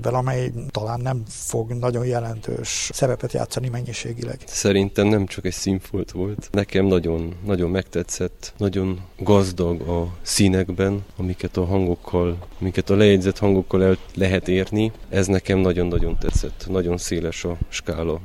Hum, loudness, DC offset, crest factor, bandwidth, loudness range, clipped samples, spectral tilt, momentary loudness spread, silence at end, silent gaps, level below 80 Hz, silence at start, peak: none; -22 LUFS; under 0.1%; 20 dB; 14.5 kHz; 5 LU; under 0.1%; -5.5 dB/octave; 9 LU; 0 s; none; -34 dBFS; 0 s; -2 dBFS